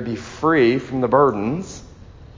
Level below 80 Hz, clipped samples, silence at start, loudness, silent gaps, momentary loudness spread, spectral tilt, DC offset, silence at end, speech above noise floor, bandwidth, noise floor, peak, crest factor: -46 dBFS; under 0.1%; 0 s; -19 LUFS; none; 15 LU; -6.5 dB/octave; under 0.1%; 0.1 s; 23 dB; 7.6 kHz; -41 dBFS; -2 dBFS; 18 dB